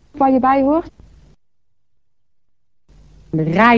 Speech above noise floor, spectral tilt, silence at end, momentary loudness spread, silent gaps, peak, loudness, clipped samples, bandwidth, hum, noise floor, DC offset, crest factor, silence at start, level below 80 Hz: 61 dB; -8 dB/octave; 0 s; 8 LU; none; 0 dBFS; -16 LUFS; under 0.1%; 7.2 kHz; none; -75 dBFS; 0.2%; 18 dB; 0.15 s; -48 dBFS